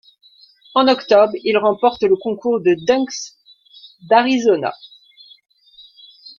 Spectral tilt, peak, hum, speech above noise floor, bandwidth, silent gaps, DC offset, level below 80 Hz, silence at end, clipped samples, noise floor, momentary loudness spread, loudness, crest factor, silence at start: -4.5 dB/octave; -2 dBFS; none; 35 dB; 7.2 kHz; none; under 0.1%; -62 dBFS; 0.1 s; under 0.1%; -51 dBFS; 9 LU; -16 LUFS; 18 dB; 0.75 s